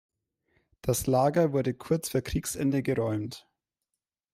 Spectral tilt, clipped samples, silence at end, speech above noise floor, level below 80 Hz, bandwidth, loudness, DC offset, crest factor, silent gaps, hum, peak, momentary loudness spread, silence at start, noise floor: -6 dB/octave; under 0.1%; 0.95 s; 60 dB; -50 dBFS; 16 kHz; -28 LUFS; under 0.1%; 18 dB; none; none; -12 dBFS; 10 LU; 0.85 s; -87 dBFS